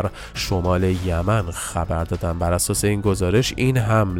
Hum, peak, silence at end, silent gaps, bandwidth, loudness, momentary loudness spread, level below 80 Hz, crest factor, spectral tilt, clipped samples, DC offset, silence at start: none; -4 dBFS; 0 s; none; 16.5 kHz; -21 LUFS; 6 LU; -34 dBFS; 16 dB; -5.5 dB/octave; under 0.1%; under 0.1%; 0 s